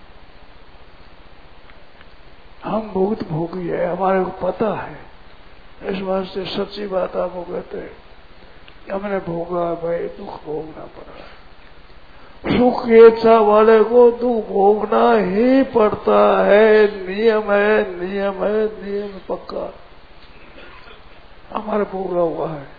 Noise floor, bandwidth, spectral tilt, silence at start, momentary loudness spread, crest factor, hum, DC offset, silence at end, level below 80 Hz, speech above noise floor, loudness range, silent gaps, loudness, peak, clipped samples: -44 dBFS; 5 kHz; -8.5 dB/octave; 2.6 s; 18 LU; 18 dB; none; 0.9%; 0.15 s; -46 dBFS; 28 dB; 14 LU; none; -17 LUFS; 0 dBFS; under 0.1%